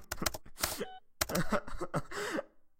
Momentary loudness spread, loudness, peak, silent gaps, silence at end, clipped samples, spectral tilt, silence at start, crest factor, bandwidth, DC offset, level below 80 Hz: 6 LU; -37 LUFS; -12 dBFS; none; 0.15 s; under 0.1%; -3.5 dB/octave; 0 s; 24 dB; 17 kHz; under 0.1%; -48 dBFS